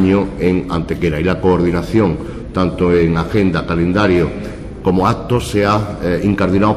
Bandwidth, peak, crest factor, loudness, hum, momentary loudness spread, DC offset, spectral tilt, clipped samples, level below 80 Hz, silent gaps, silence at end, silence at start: 14.5 kHz; -2 dBFS; 12 dB; -15 LUFS; none; 6 LU; under 0.1%; -7.5 dB/octave; under 0.1%; -30 dBFS; none; 0 s; 0 s